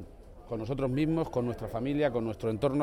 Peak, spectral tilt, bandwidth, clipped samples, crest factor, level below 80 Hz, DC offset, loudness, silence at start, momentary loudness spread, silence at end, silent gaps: -16 dBFS; -8 dB/octave; 16 kHz; under 0.1%; 16 dB; -50 dBFS; under 0.1%; -31 LUFS; 0 s; 8 LU; 0 s; none